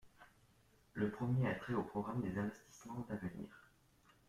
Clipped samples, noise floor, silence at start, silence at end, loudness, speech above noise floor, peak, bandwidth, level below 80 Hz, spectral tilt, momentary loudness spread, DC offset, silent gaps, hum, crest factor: under 0.1%; -71 dBFS; 0.05 s; 0.7 s; -42 LUFS; 30 dB; -26 dBFS; 13.5 kHz; -68 dBFS; -8 dB/octave; 15 LU; under 0.1%; none; none; 18 dB